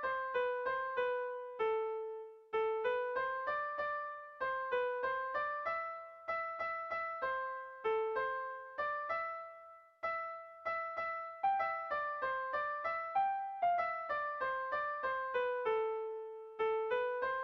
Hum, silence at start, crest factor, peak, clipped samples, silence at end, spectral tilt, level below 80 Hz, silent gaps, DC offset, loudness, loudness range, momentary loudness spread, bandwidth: none; 0 s; 14 dB; -24 dBFS; under 0.1%; 0 s; -4.5 dB/octave; -74 dBFS; none; under 0.1%; -38 LUFS; 3 LU; 8 LU; 6.2 kHz